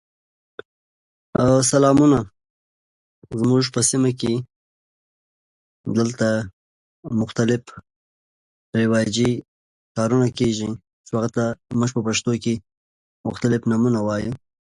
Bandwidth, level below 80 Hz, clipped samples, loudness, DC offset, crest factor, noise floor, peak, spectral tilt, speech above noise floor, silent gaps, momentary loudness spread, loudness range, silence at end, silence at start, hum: 11.5 kHz; -52 dBFS; under 0.1%; -21 LUFS; under 0.1%; 20 dB; under -90 dBFS; -4 dBFS; -5.5 dB/octave; over 70 dB; 2.50-3.22 s, 4.56-5.84 s, 6.53-7.03 s, 7.96-8.73 s, 9.48-9.95 s, 10.93-11.04 s, 12.77-13.24 s; 15 LU; 6 LU; 0.4 s; 1.35 s; none